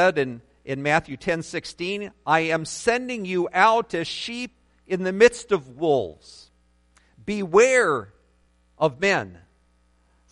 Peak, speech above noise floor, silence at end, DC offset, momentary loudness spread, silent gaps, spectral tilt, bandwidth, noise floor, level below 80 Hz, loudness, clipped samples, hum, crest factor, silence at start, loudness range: -2 dBFS; 40 dB; 0.95 s; under 0.1%; 13 LU; none; -4 dB/octave; 11.5 kHz; -62 dBFS; -58 dBFS; -23 LUFS; under 0.1%; none; 22 dB; 0 s; 3 LU